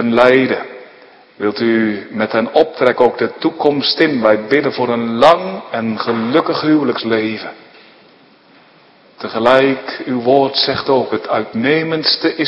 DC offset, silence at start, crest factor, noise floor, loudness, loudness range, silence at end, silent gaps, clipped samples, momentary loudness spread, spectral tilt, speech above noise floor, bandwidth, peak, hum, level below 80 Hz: under 0.1%; 0 s; 16 dB; -47 dBFS; -14 LUFS; 5 LU; 0 s; none; 0.2%; 10 LU; -6.5 dB/octave; 33 dB; 9.8 kHz; 0 dBFS; none; -56 dBFS